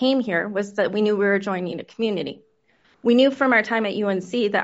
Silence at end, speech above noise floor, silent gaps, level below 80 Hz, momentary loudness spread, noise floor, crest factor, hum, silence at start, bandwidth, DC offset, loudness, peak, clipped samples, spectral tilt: 0 s; 40 dB; none; -70 dBFS; 10 LU; -61 dBFS; 18 dB; none; 0 s; 8 kHz; under 0.1%; -21 LUFS; -4 dBFS; under 0.1%; -3.5 dB/octave